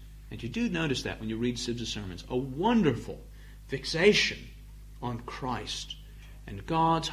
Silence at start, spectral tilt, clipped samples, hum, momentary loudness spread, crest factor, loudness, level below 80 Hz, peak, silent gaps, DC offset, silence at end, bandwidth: 0 s; -4.5 dB/octave; under 0.1%; none; 22 LU; 22 dB; -30 LUFS; -46 dBFS; -8 dBFS; none; under 0.1%; 0 s; 15 kHz